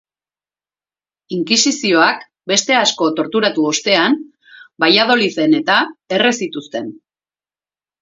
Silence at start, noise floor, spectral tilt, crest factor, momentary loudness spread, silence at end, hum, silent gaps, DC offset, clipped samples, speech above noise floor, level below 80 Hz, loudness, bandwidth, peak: 1.3 s; under -90 dBFS; -2.5 dB/octave; 18 dB; 12 LU; 1.05 s; 50 Hz at -45 dBFS; none; under 0.1%; under 0.1%; over 75 dB; -66 dBFS; -14 LUFS; 7.8 kHz; 0 dBFS